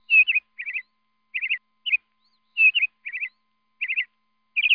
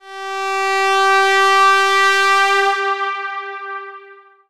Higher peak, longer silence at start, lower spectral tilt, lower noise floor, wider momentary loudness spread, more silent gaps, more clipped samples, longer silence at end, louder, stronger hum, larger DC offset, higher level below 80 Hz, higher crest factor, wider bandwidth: second, -8 dBFS vs -2 dBFS; about the same, 0.1 s vs 0.05 s; about the same, 2 dB/octave vs 1 dB/octave; first, -72 dBFS vs -43 dBFS; about the same, 16 LU vs 16 LU; neither; neither; second, 0 s vs 0.3 s; second, -22 LUFS vs -14 LUFS; neither; neither; about the same, -76 dBFS vs -72 dBFS; about the same, 16 dB vs 14 dB; second, 5.2 kHz vs 16 kHz